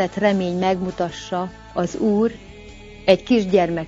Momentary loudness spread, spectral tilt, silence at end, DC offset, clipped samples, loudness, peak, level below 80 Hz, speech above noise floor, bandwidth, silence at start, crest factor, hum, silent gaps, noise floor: 18 LU; -6.5 dB/octave; 0 s; under 0.1%; under 0.1%; -21 LUFS; 0 dBFS; -46 dBFS; 20 dB; 7.8 kHz; 0 s; 20 dB; none; none; -40 dBFS